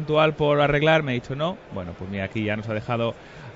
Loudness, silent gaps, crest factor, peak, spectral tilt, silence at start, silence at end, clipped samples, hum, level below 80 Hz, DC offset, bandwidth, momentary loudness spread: -23 LUFS; none; 18 dB; -6 dBFS; -7 dB/octave; 0 s; 0 s; under 0.1%; none; -50 dBFS; under 0.1%; 7.8 kHz; 14 LU